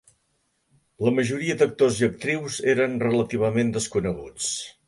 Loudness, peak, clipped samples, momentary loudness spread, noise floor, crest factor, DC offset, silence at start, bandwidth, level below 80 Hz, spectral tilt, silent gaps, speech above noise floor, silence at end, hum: -24 LUFS; -8 dBFS; under 0.1%; 7 LU; -71 dBFS; 18 dB; under 0.1%; 1 s; 11.5 kHz; -54 dBFS; -5 dB/octave; none; 48 dB; 0.15 s; none